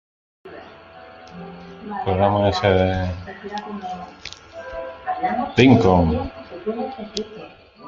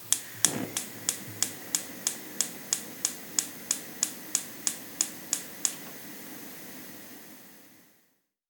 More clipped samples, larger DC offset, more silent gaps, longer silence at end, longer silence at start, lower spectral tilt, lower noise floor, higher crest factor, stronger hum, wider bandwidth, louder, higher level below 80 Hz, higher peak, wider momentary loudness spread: neither; neither; neither; second, 0 s vs 0.6 s; first, 0.45 s vs 0 s; first, -7 dB/octave vs -0.5 dB/octave; second, -43 dBFS vs -71 dBFS; second, 20 dB vs 34 dB; neither; second, 7.4 kHz vs over 20 kHz; first, -20 LUFS vs -31 LUFS; first, -44 dBFS vs -80 dBFS; about the same, -2 dBFS vs 0 dBFS; first, 24 LU vs 14 LU